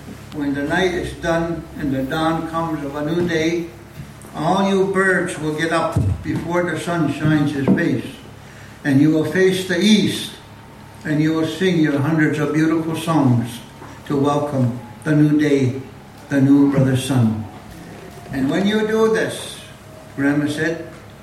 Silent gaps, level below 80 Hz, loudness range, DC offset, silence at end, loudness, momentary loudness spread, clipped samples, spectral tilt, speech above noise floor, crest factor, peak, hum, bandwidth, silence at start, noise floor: none; -44 dBFS; 3 LU; under 0.1%; 0 s; -19 LUFS; 19 LU; under 0.1%; -6 dB/octave; 22 dB; 16 dB; -4 dBFS; none; 15 kHz; 0 s; -40 dBFS